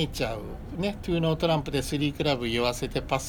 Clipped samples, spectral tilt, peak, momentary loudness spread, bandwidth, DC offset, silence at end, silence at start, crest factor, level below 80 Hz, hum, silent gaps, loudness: under 0.1%; -5 dB/octave; -10 dBFS; 6 LU; over 20 kHz; under 0.1%; 0 s; 0 s; 18 dB; -42 dBFS; none; none; -28 LUFS